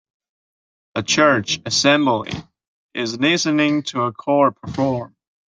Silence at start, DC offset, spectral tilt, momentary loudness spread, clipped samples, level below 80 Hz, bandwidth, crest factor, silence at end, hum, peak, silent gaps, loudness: 0.95 s; under 0.1%; -4 dB/octave; 14 LU; under 0.1%; -56 dBFS; 9.4 kHz; 18 dB; 0.4 s; none; -2 dBFS; 2.68-2.89 s; -18 LUFS